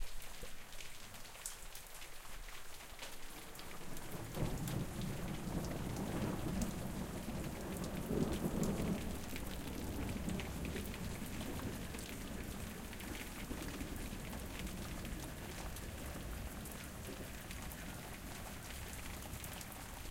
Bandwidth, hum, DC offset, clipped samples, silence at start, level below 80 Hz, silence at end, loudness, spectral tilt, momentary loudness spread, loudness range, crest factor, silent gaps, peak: 17 kHz; none; under 0.1%; under 0.1%; 0 s; -50 dBFS; 0 s; -45 LUFS; -5 dB/octave; 10 LU; 6 LU; 22 dB; none; -22 dBFS